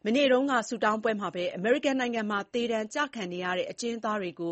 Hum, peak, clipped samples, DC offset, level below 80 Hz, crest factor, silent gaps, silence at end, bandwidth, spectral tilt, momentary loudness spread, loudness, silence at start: none; -12 dBFS; under 0.1%; under 0.1%; -72 dBFS; 16 dB; none; 0 s; 8.4 kHz; -4 dB/octave; 8 LU; -29 LUFS; 0.05 s